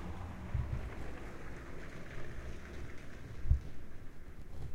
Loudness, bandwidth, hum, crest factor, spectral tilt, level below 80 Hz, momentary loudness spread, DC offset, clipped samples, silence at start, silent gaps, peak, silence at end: -44 LUFS; 10 kHz; none; 22 dB; -7 dB/octave; -44 dBFS; 16 LU; under 0.1%; under 0.1%; 0 s; none; -16 dBFS; 0 s